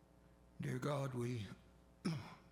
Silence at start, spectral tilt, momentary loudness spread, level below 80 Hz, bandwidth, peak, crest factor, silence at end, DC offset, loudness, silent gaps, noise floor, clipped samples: 0.15 s; -6.5 dB/octave; 9 LU; -70 dBFS; 16 kHz; -28 dBFS; 16 dB; 0 s; under 0.1%; -45 LUFS; none; -67 dBFS; under 0.1%